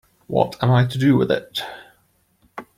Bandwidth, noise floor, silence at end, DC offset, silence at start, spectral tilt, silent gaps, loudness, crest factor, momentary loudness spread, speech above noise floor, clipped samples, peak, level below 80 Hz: 15 kHz; -62 dBFS; 0.15 s; under 0.1%; 0.3 s; -7.5 dB/octave; none; -20 LUFS; 18 dB; 19 LU; 44 dB; under 0.1%; -4 dBFS; -54 dBFS